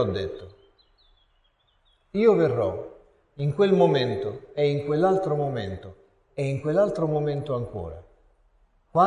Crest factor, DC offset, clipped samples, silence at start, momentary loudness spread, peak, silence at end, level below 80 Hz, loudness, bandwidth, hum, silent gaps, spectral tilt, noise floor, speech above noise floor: 20 dB; under 0.1%; under 0.1%; 0 s; 17 LU; -6 dBFS; 0 s; -52 dBFS; -25 LUFS; 10 kHz; none; none; -8 dB/octave; -66 dBFS; 42 dB